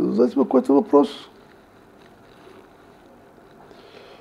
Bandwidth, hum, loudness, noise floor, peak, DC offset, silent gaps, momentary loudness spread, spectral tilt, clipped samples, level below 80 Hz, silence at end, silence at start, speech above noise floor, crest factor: 11 kHz; none; -19 LUFS; -50 dBFS; -2 dBFS; under 0.1%; none; 8 LU; -7.5 dB/octave; under 0.1%; -66 dBFS; 2.95 s; 0 s; 32 dB; 20 dB